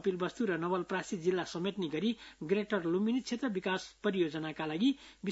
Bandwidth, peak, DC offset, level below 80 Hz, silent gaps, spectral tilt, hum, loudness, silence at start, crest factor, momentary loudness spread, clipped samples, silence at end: 7.6 kHz; -18 dBFS; under 0.1%; -70 dBFS; none; -4.5 dB/octave; none; -34 LUFS; 0 s; 16 dB; 5 LU; under 0.1%; 0 s